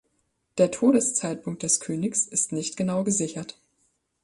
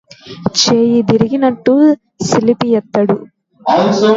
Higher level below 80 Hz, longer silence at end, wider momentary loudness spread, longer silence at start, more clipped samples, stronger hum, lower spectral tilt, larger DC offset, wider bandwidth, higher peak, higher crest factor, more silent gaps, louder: second, -66 dBFS vs -50 dBFS; first, 0.75 s vs 0 s; first, 11 LU vs 7 LU; first, 0.55 s vs 0.25 s; neither; neither; about the same, -4.5 dB/octave vs -5 dB/octave; neither; first, 11.5 kHz vs 7.8 kHz; second, -8 dBFS vs 0 dBFS; first, 20 dB vs 12 dB; neither; second, -24 LUFS vs -13 LUFS